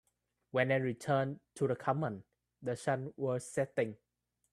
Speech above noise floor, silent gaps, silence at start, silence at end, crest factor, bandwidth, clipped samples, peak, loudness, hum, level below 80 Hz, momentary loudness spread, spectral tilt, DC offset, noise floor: 31 dB; none; 0.55 s; 0.6 s; 20 dB; 13 kHz; under 0.1%; -16 dBFS; -36 LUFS; none; -74 dBFS; 8 LU; -6.5 dB/octave; under 0.1%; -66 dBFS